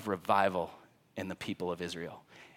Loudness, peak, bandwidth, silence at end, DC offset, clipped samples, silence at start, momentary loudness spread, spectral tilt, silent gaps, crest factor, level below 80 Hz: -34 LUFS; -12 dBFS; 17 kHz; 0.1 s; under 0.1%; under 0.1%; 0 s; 16 LU; -5 dB/octave; none; 22 dB; -70 dBFS